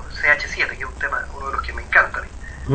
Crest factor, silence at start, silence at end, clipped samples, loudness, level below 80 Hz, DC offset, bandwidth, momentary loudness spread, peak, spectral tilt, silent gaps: 20 dB; 0 s; 0 s; under 0.1%; -20 LUFS; -34 dBFS; under 0.1%; 9.2 kHz; 13 LU; -2 dBFS; -4.5 dB/octave; none